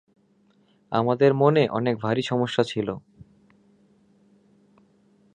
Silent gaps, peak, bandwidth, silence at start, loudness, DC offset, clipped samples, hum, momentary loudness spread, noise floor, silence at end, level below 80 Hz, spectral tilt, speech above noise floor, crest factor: none; -4 dBFS; 9.8 kHz; 0.9 s; -23 LUFS; under 0.1%; under 0.1%; none; 10 LU; -62 dBFS; 2.35 s; -64 dBFS; -7 dB/octave; 40 dB; 22 dB